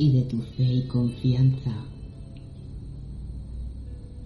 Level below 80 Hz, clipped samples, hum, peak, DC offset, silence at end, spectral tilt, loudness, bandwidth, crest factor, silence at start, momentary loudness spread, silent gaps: -40 dBFS; under 0.1%; none; -10 dBFS; under 0.1%; 0 s; -9.5 dB/octave; -25 LUFS; 4.9 kHz; 16 dB; 0 s; 20 LU; none